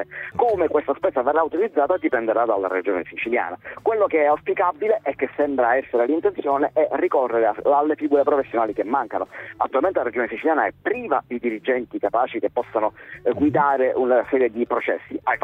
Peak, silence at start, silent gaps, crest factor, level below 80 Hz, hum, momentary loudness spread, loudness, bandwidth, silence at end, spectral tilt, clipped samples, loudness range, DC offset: -6 dBFS; 0 s; none; 16 dB; -60 dBFS; none; 7 LU; -21 LUFS; 4.2 kHz; 0.05 s; -8 dB/octave; under 0.1%; 3 LU; under 0.1%